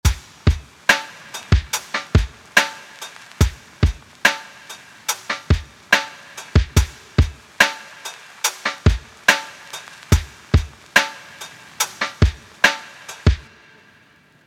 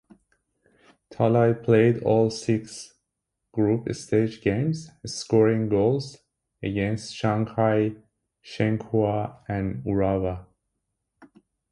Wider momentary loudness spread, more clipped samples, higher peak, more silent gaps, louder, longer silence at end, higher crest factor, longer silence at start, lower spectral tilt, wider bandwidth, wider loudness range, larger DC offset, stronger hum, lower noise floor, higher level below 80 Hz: first, 17 LU vs 14 LU; neither; first, 0 dBFS vs -6 dBFS; neither; first, -20 LUFS vs -24 LUFS; first, 1.05 s vs 0.45 s; about the same, 22 dB vs 18 dB; second, 0.05 s vs 1.1 s; second, -3.5 dB/octave vs -7 dB/octave; first, 17 kHz vs 11.5 kHz; about the same, 2 LU vs 4 LU; neither; neither; second, -53 dBFS vs -82 dBFS; first, -28 dBFS vs -50 dBFS